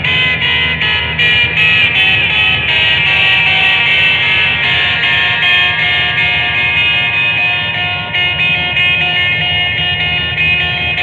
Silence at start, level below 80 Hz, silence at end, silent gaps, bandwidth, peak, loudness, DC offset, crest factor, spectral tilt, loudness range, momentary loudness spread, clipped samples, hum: 0 s; -36 dBFS; 0 s; none; 9.2 kHz; 0 dBFS; -9 LUFS; under 0.1%; 12 dB; -4 dB/octave; 3 LU; 4 LU; under 0.1%; none